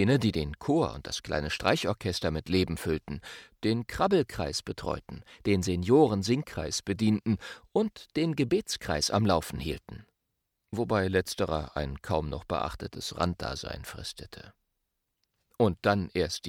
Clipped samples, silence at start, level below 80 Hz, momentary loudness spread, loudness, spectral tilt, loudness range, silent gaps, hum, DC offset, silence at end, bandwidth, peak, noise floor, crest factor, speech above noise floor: under 0.1%; 0 s; -48 dBFS; 13 LU; -30 LUFS; -5.5 dB/octave; 6 LU; none; none; under 0.1%; 0 s; 17.5 kHz; -8 dBFS; -82 dBFS; 22 dB; 53 dB